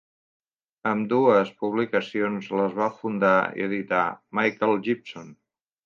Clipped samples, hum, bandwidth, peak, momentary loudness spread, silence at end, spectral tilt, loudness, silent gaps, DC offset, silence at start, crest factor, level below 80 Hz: under 0.1%; none; 7.2 kHz; -6 dBFS; 8 LU; 0.5 s; -7 dB/octave; -24 LUFS; none; under 0.1%; 0.85 s; 18 dB; -72 dBFS